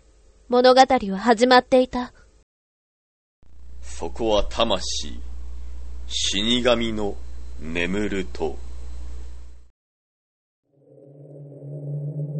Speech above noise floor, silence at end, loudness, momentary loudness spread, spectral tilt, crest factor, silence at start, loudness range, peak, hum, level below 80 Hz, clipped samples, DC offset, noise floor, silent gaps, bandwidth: 33 dB; 0 s; -21 LUFS; 23 LU; -4 dB/octave; 24 dB; 0 s; 18 LU; 0 dBFS; none; -38 dBFS; under 0.1%; under 0.1%; -53 dBFS; 2.43-3.42 s, 9.70-10.63 s; 8.8 kHz